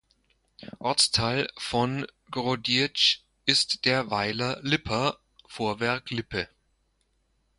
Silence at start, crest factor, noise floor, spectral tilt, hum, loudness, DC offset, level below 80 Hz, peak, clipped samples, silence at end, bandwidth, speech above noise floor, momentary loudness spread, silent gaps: 0.6 s; 24 dB; -71 dBFS; -3 dB/octave; none; -26 LUFS; under 0.1%; -56 dBFS; -6 dBFS; under 0.1%; 1.15 s; 11.5 kHz; 44 dB; 12 LU; none